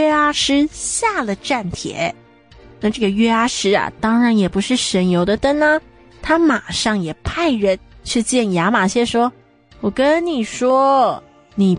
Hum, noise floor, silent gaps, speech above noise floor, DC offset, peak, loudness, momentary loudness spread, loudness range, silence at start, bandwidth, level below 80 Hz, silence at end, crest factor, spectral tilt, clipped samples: none; -45 dBFS; none; 28 dB; under 0.1%; -4 dBFS; -17 LUFS; 8 LU; 3 LU; 0 s; 10.5 kHz; -44 dBFS; 0 s; 14 dB; -4.5 dB/octave; under 0.1%